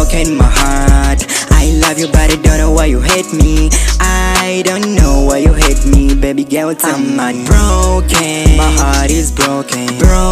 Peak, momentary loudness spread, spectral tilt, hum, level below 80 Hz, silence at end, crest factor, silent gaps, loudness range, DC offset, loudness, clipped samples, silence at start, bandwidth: 0 dBFS; 4 LU; -4.5 dB/octave; none; -12 dBFS; 0 s; 8 dB; none; 1 LU; under 0.1%; -11 LUFS; under 0.1%; 0 s; 15.5 kHz